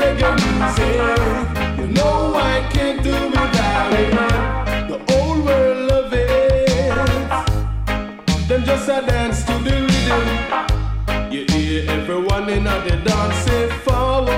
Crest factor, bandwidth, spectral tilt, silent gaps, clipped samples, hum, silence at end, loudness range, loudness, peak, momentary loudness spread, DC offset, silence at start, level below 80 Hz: 10 dB; 16 kHz; -5.5 dB/octave; none; under 0.1%; none; 0 s; 2 LU; -18 LUFS; -6 dBFS; 5 LU; under 0.1%; 0 s; -24 dBFS